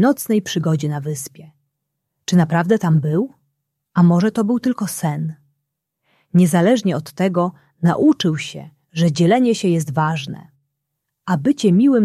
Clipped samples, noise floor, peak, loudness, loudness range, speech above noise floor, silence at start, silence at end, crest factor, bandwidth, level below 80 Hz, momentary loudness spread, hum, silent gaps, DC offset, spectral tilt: under 0.1%; -77 dBFS; -2 dBFS; -18 LUFS; 2 LU; 60 dB; 0 s; 0 s; 16 dB; 14.5 kHz; -60 dBFS; 14 LU; none; none; under 0.1%; -6.5 dB/octave